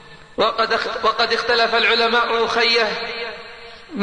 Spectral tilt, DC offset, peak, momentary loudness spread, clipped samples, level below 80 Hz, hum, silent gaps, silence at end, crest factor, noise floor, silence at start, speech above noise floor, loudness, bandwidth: -2.5 dB/octave; 0.3%; -6 dBFS; 18 LU; under 0.1%; -52 dBFS; none; none; 0 s; 14 dB; -38 dBFS; 0.05 s; 20 dB; -17 LUFS; 10 kHz